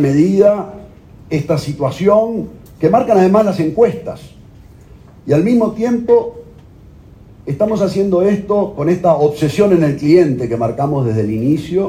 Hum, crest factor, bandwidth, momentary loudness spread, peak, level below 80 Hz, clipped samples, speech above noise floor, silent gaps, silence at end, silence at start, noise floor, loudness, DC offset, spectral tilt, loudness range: none; 14 dB; 15.5 kHz; 12 LU; 0 dBFS; -44 dBFS; under 0.1%; 27 dB; none; 0 s; 0 s; -40 dBFS; -14 LUFS; under 0.1%; -8 dB/octave; 4 LU